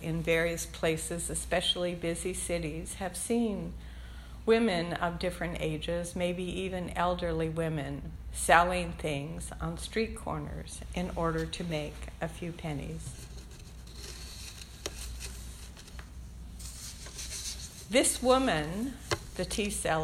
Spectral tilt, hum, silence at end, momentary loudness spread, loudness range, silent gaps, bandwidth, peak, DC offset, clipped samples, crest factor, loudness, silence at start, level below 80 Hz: -4 dB/octave; none; 0 s; 18 LU; 12 LU; none; 16.5 kHz; -8 dBFS; under 0.1%; under 0.1%; 26 dB; -32 LUFS; 0 s; -46 dBFS